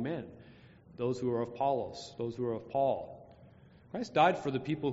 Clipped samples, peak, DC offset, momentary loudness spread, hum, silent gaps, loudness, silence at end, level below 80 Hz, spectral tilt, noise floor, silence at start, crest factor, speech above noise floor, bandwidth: under 0.1%; -14 dBFS; under 0.1%; 17 LU; none; none; -33 LUFS; 0 s; -68 dBFS; -5 dB/octave; -58 dBFS; 0 s; 22 dB; 25 dB; 8 kHz